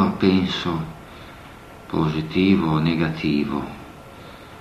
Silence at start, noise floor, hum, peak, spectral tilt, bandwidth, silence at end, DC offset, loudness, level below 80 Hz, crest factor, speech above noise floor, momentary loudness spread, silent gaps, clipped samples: 0 s; -41 dBFS; none; -4 dBFS; -7.5 dB/octave; 13.5 kHz; 0 s; under 0.1%; -21 LUFS; -48 dBFS; 18 dB; 21 dB; 23 LU; none; under 0.1%